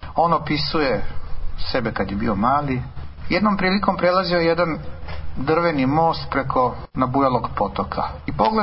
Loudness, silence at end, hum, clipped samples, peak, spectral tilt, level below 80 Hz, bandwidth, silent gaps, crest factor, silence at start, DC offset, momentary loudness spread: -21 LUFS; 0 s; none; under 0.1%; -4 dBFS; -10.5 dB/octave; -36 dBFS; 5.8 kHz; none; 18 dB; 0 s; under 0.1%; 13 LU